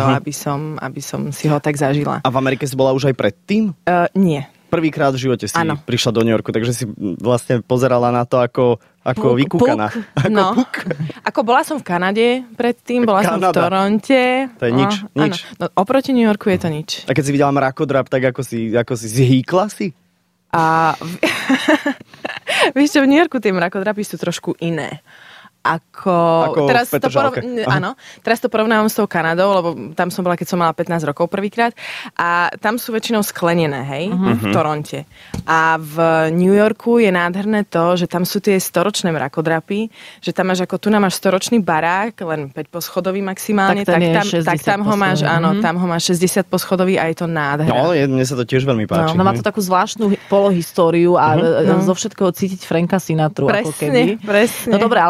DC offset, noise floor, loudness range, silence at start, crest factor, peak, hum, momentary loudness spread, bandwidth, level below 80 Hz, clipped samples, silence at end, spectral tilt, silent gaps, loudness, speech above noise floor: under 0.1%; -61 dBFS; 3 LU; 0 s; 14 dB; -2 dBFS; none; 8 LU; 16 kHz; -54 dBFS; under 0.1%; 0 s; -5.5 dB/octave; none; -16 LUFS; 45 dB